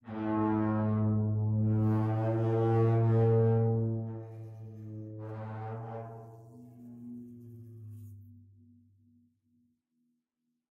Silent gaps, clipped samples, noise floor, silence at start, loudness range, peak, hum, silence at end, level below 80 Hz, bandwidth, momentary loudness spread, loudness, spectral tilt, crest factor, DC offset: none; under 0.1%; -84 dBFS; 0.05 s; 23 LU; -18 dBFS; none; 2.35 s; -62 dBFS; 3.5 kHz; 23 LU; -30 LUFS; -11.5 dB/octave; 14 dB; under 0.1%